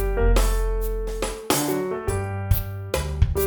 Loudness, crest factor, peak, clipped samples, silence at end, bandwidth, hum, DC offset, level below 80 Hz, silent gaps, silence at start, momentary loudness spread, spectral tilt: -25 LUFS; 18 dB; -4 dBFS; under 0.1%; 0 s; over 20 kHz; none; under 0.1%; -26 dBFS; none; 0 s; 7 LU; -5 dB/octave